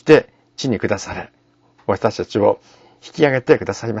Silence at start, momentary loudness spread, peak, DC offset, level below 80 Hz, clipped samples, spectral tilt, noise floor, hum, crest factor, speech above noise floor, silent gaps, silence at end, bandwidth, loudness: 0.05 s; 17 LU; 0 dBFS; under 0.1%; -52 dBFS; under 0.1%; -6 dB/octave; -55 dBFS; none; 18 dB; 38 dB; none; 0 s; 8 kHz; -19 LUFS